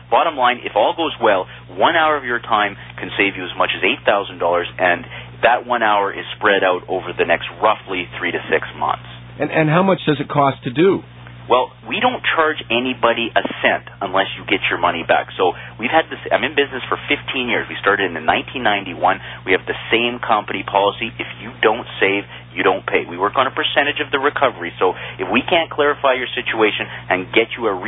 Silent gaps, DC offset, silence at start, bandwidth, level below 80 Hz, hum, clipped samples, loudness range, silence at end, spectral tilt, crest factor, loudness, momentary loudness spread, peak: none; under 0.1%; 0 s; 4 kHz; -50 dBFS; none; under 0.1%; 1 LU; 0 s; -10 dB/octave; 18 dB; -18 LUFS; 7 LU; 0 dBFS